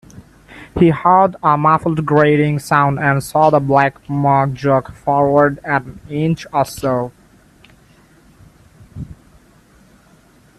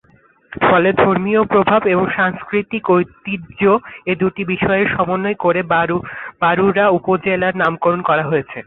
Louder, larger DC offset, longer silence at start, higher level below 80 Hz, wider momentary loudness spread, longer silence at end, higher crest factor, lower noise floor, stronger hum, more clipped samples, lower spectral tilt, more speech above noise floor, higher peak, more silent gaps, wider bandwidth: about the same, -15 LUFS vs -16 LUFS; neither; second, 0.15 s vs 0.5 s; about the same, -46 dBFS vs -48 dBFS; first, 10 LU vs 7 LU; first, 1.45 s vs 0.05 s; about the same, 16 dB vs 14 dB; about the same, -49 dBFS vs -52 dBFS; neither; neither; second, -7.5 dB/octave vs -10 dB/octave; about the same, 35 dB vs 36 dB; about the same, 0 dBFS vs -2 dBFS; neither; first, 13 kHz vs 4.1 kHz